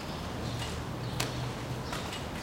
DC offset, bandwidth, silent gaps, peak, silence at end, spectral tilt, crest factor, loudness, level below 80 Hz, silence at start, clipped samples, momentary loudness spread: under 0.1%; 17 kHz; none; -12 dBFS; 0 s; -4.5 dB/octave; 24 dB; -36 LUFS; -46 dBFS; 0 s; under 0.1%; 3 LU